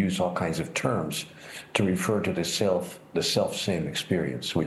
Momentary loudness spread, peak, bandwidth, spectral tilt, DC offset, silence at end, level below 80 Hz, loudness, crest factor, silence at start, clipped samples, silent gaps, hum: 7 LU; -8 dBFS; 12.5 kHz; -4.5 dB/octave; under 0.1%; 0 s; -58 dBFS; -27 LUFS; 20 dB; 0 s; under 0.1%; none; none